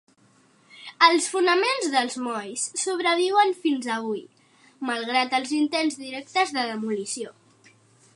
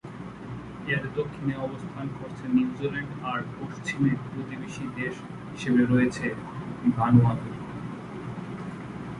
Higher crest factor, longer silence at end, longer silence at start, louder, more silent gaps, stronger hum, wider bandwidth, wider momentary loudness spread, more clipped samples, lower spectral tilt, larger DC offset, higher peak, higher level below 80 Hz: about the same, 22 dB vs 22 dB; first, 0.85 s vs 0 s; first, 0.75 s vs 0.05 s; first, -24 LUFS vs -28 LUFS; neither; neither; about the same, 11.5 kHz vs 11 kHz; second, 13 LU vs 16 LU; neither; second, -2 dB/octave vs -7.5 dB/octave; neither; about the same, -4 dBFS vs -6 dBFS; second, -84 dBFS vs -54 dBFS